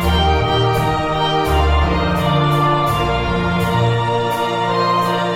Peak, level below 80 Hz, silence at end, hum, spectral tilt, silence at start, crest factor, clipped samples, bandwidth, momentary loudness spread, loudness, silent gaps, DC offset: -4 dBFS; -24 dBFS; 0 s; none; -6 dB/octave; 0 s; 12 dB; under 0.1%; 16.5 kHz; 3 LU; -16 LUFS; none; 0.3%